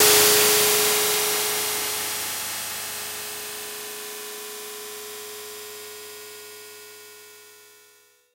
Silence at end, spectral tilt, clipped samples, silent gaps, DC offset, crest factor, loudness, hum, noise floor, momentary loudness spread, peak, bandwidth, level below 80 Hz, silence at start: 0.8 s; 0.5 dB/octave; under 0.1%; none; under 0.1%; 22 dB; -21 LUFS; none; -57 dBFS; 23 LU; -4 dBFS; 16 kHz; -64 dBFS; 0 s